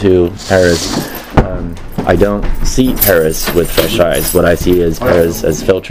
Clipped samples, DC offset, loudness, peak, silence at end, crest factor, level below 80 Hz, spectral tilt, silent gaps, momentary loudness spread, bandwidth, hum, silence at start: 0.4%; under 0.1%; -12 LUFS; 0 dBFS; 0 s; 12 dB; -20 dBFS; -5 dB/octave; none; 8 LU; 16.5 kHz; none; 0 s